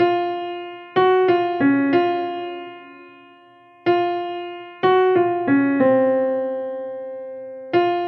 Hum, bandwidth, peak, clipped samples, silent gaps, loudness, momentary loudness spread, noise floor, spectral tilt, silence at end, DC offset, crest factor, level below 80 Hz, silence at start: none; 5.4 kHz; -6 dBFS; under 0.1%; none; -20 LUFS; 16 LU; -49 dBFS; -8.5 dB/octave; 0 s; under 0.1%; 14 dB; -72 dBFS; 0 s